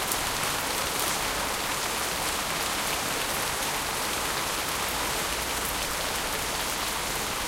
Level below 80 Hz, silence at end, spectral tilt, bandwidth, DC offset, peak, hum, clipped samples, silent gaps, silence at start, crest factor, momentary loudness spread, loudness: -46 dBFS; 0 s; -1 dB/octave; 17 kHz; under 0.1%; -4 dBFS; none; under 0.1%; none; 0 s; 26 dB; 2 LU; -27 LUFS